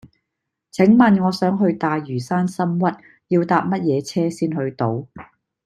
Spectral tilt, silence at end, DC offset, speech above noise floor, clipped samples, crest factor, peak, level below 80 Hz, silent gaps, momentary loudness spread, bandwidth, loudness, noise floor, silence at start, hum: -7.5 dB/octave; 0.4 s; under 0.1%; 61 dB; under 0.1%; 18 dB; -2 dBFS; -60 dBFS; none; 10 LU; 12.5 kHz; -19 LUFS; -80 dBFS; 0.75 s; none